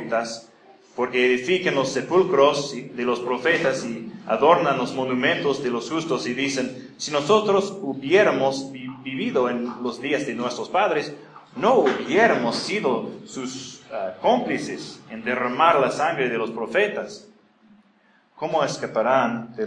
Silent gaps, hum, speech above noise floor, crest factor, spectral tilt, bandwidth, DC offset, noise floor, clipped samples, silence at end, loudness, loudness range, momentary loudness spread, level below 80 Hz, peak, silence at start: none; none; 37 dB; 20 dB; -4.5 dB/octave; 10.5 kHz; under 0.1%; -59 dBFS; under 0.1%; 0 s; -22 LUFS; 4 LU; 14 LU; -68 dBFS; -2 dBFS; 0 s